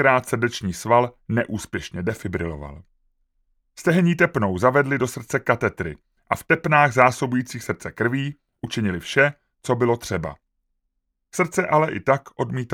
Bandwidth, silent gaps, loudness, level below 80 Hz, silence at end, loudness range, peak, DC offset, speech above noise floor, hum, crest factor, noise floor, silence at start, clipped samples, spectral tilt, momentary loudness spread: 17 kHz; none; -22 LUFS; -50 dBFS; 0 s; 5 LU; 0 dBFS; under 0.1%; 54 dB; none; 22 dB; -75 dBFS; 0 s; under 0.1%; -6 dB/octave; 12 LU